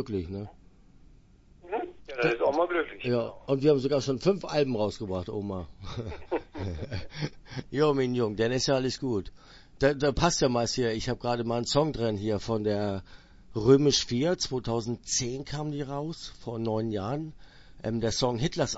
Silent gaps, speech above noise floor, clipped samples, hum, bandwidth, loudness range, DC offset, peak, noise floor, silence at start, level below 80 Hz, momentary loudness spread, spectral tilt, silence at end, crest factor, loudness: none; 28 dB; under 0.1%; none; 8 kHz; 5 LU; under 0.1%; -6 dBFS; -56 dBFS; 0 s; -50 dBFS; 13 LU; -5 dB/octave; 0 s; 22 dB; -29 LUFS